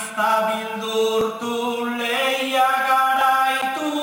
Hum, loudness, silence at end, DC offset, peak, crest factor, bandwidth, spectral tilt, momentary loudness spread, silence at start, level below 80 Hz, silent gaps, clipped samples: none; -20 LUFS; 0 s; under 0.1%; -8 dBFS; 14 dB; 18 kHz; -2.5 dB/octave; 7 LU; 0 s; -62 dBFS; none; under 0.1%